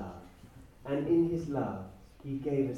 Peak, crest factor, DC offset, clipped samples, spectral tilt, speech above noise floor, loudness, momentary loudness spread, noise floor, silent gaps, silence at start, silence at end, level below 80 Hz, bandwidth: -18 dBFS; 16 dB; under 0.1%; under 0.1%; -9 dB/octave; 20 dB; -33 LUFS; 21 LU; -54 dBFS; none; 0 s; 0 s; -58 dBFS; 7.4 kHz